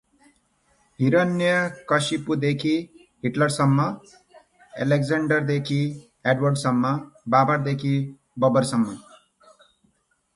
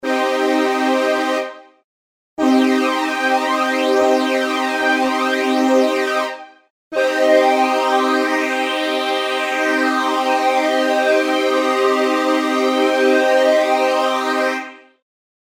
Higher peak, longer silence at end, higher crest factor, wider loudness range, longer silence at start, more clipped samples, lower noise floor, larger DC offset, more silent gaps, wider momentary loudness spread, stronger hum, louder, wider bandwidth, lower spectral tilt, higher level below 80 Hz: second, -6 dBFS vs -2 dBFS; first, 1.35 s vs 0.65 s; about the same, 18 dB vs 14 dB; about the same, 2 LU vs 2 LU; first, 1 s vs 0.05 s; neither; second, -68 dBFS vs under -90 dBFS; neither; second, none vs 1.84-2.37 s, 6.70-6.91 s; first, 9 LU vs 5 LU; neither; second, -23 LUFS vs -16 LUFS; second, 11.5 kHz vs 16.5 kHz; first, -6 dB/octave vs -2 dB/octave; first, -62 dBFS vs -72 dBFS